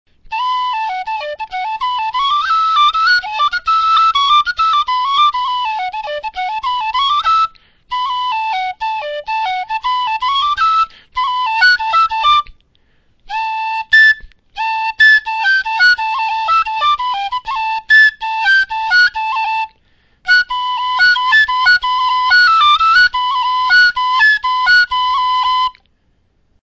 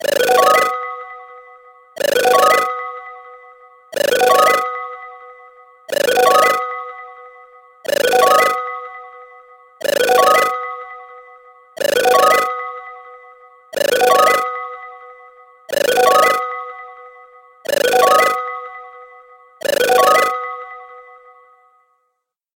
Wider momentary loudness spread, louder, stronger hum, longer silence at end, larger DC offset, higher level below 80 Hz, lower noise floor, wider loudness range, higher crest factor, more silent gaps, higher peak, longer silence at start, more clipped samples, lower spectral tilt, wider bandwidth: second, 12 LU vs 22 LU; about the same, -13 LUFS vs -14 LUFS; neither; second, 0.9 s vs 1.55 s; neither; first, -48 dBFS vs -62 dBFS; second, -58 dBFS vs -72 dBFS; first, 6 LU vs 3 LU; about the same, 14 dB vs 18 dB; neither; about the same, 0 dBFS vs 0 dBFS; first, 0.3 s vs 0 s; neither; second, 1 dB/octave vs -1 dB/octave; second, 8 kHz vs 17 kHz